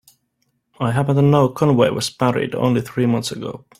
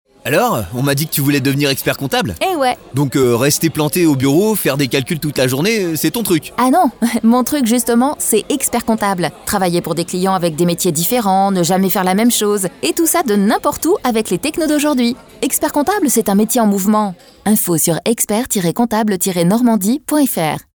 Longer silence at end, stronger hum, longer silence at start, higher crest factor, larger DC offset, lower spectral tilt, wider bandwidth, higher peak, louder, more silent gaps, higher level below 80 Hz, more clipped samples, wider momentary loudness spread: about the same, 0.2 s vs 0.15 s; neither; first, 0.8 s vs 0.25 s; about the same, 16 dB vs 12 dB; neither; first, -6.5 dB/octave vs -4.5 dB/octave; second, 15 kHz vs over 20 kHz; about the same, -2 dBFS vs -2 dBFS; second, -18 LUFS vs -15 LUFS; neither; second, -54 dBFS vs -48 dBFS; neither; first, 8 LU vs 4 LU